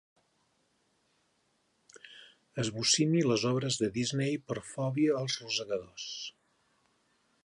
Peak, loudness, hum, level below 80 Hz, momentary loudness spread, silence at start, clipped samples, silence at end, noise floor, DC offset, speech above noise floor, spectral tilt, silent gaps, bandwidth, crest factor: -14 dBFS; -31 LUFS; none; -70 dBFS; 16 LU; 1.95 s; under 0.1%; 1.15 s; -74 dBFS; under 0.1%; 43 dB; -4 dB/octave; none; 11.5 kHz; 20 dB